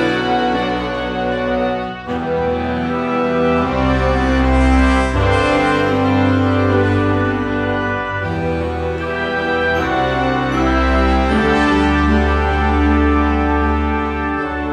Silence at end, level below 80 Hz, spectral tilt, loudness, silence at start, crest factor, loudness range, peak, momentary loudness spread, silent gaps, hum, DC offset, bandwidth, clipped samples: 0 s; -24 dBFS; -7 dB/octave; -16 LUFS; 0 s; 14 dB; 4 LU; -2 dBFS; 6 LU; none; none; under 0.1%; 10 kHz; under 0.1%